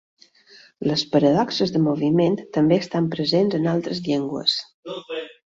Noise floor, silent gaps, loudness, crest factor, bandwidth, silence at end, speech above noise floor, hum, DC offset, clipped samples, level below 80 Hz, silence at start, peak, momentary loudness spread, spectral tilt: -51 dBFS; 4.74-4.83 s; -21 LUFS; 16 dB; 7.8 kHz; 0.25 s; 30 dB; none; under 0.1%; under 0.1%; -60 dBFS; 0.8 s; -6 dBFS; 12 LU; -6.5 dB/octave